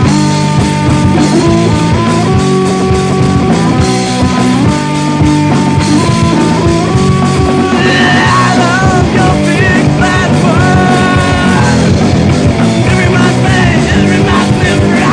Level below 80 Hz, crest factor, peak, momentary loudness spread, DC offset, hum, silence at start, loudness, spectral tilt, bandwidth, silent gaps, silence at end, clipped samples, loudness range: -24 dBFS; 8 dB; 0 dBFS; 2 LU; under 0.1%; none; 0 s; -8 LUFS; -6 dB/octave; 10 kHz; none; 0 s; 0.2%; 2 LU